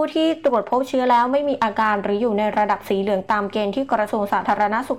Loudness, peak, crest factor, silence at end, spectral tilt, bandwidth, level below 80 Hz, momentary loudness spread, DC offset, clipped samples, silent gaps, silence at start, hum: -20 LUFS; -8 dBFS; 12 dB; 0 s; -6 dB/octave; 16.5 kHz; -58 dBFS; 4 LU; 0.2%; under 0.1%; none; 0 s; none